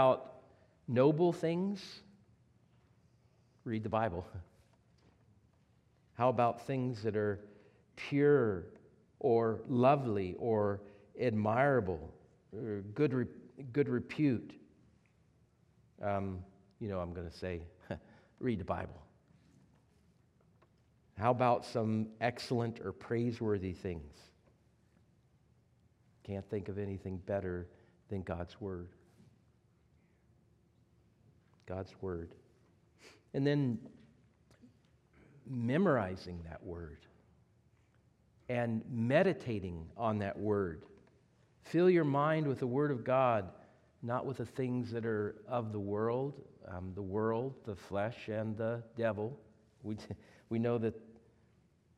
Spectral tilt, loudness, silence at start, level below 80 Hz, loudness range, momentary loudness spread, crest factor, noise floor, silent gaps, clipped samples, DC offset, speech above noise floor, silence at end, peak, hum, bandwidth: -8 dB/octave; -35 LUFS; 0 s; -66 dBFS; 11 LU; 17 LU; 22 dB; -70 dBFS; none; under 0.1%; under 0.1%; 35 dB; 0.85 s; -16 dBFS; none; 11.5 kHz